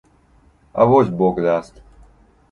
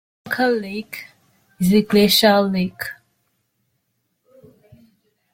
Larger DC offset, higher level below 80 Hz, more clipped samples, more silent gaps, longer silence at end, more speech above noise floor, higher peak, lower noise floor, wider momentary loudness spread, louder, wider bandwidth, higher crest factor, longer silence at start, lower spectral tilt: neither; first, -48 dBFS vs -56 dBFS; neither; neither; second, 0.9 s vs 2.4 s; second, 38 dB vs 54 dB; about the same, -2 dBFS vs -2 dBFS; second, -54 dBFS vs -71 dBFS; second, 9 LU vs 18 LU; about the same, -17 LUFS vs -18 LUFS; second, 10 kHz vs 16.5 kHz; about the same, 18 dB vs 20 dB; first, 0.75 s vs 0.25 s; first, -9 dB/octave vs -4.5 dB/octave